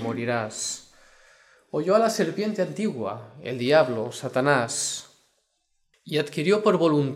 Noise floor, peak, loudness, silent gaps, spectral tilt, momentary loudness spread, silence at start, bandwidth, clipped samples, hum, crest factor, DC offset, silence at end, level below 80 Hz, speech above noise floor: -72 dBFS; -4 dBFS; -24 LUFS; none; -4.5 dB/octave; 12 LU; 0 s; 15.5 kHz; under 0.1%; none; 20 dB; under 0.1%; 0 s; -72 dBFS; 48 dB